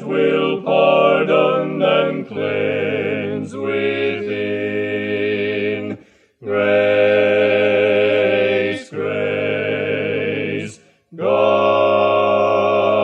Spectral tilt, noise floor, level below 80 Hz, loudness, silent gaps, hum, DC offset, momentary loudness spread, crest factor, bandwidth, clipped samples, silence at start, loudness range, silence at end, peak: -6.5 dB/octave; -44 dBFS; -68 dBFS; -17 LUFS; none; none; under 0.1%; 9 LU; 14 dB; 8.8 kHz; under 0.1%; 0 s; 5 LU; 0 s; -2 dBFS